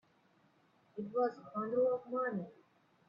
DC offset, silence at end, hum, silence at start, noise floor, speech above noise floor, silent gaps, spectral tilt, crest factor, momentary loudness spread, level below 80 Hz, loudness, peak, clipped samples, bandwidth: under 0.1%; 0.55 s; none; 0.95 s; -71 dBFS; 35 dB; none; -9 dB/octave; 16 dB; 14 LU; -84 dBFS; -37 LUFS; -24 dBFS; under 0.1%; 5.6 kHz